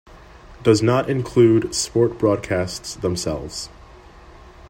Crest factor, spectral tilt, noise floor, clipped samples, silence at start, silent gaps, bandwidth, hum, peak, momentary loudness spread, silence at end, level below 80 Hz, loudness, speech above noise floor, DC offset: 20 dB; -5.5 dB/octave; -44 dBFS; under 0.1%; 0.1 s; none; 16 kHz; none; -2 dBFS; 12 LU; 0 s; -46 dBFS; -20 LUFS; 25 dB; under 0.1%